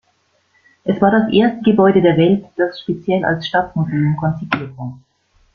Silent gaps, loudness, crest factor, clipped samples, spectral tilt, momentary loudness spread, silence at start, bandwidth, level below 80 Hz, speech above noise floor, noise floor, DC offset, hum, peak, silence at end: none; -16 LUFS; 16 dB; under 0.1%; -9 dB/octave; 11 LU; 0.85 s; 6.6 kHz; -52 dBFS; 46 dB; -62 dBFS; under 0.1%; none; -2 dBFS; 0.6 s